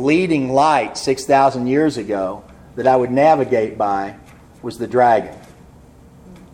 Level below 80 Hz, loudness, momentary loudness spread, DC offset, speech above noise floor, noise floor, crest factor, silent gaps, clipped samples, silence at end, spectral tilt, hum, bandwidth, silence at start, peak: -50 dBFS; -17 LUFS; 16 LU; under 0.1%; 28 dB; -44 dBFS; 16 dB; none; under 0.1%; 0.15 s; -5.5 dB/octave; none; 16 kHz; 0 s; -2 dBFS